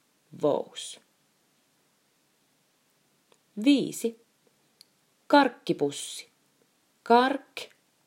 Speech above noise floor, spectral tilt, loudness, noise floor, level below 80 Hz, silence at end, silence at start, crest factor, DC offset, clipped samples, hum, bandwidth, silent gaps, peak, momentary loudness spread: 44 dB; -4 dB/octave; -26 LUFS; -69 dBFS; -88 dBFS; 0.4 s; 0.35 s; 24 dB; under 0.1%; under 0.1%; none; 16 kHz; none; -6 dBFS; 20 LU